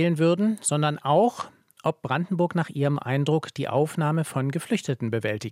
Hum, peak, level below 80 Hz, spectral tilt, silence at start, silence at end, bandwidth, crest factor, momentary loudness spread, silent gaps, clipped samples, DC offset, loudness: none; -8 dBFS; -72 dBFS; -6 dB/octave; 0 s; 0 s; 15 kHz; 16 dB; 6 LU; none; under 0.1%; under 0.1%; -25 LUFS